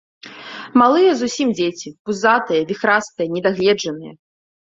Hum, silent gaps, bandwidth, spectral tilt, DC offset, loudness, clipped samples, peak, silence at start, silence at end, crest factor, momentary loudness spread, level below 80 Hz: none; 1.99-2.05 s; 7.8 kHz; -4.5 dB/octave; under 0.1%; -17 LUFS; under 0.1%; -2 dBFS; 0.25 s; 0.65 s; 16 dB; 17 LU; -62 dBFS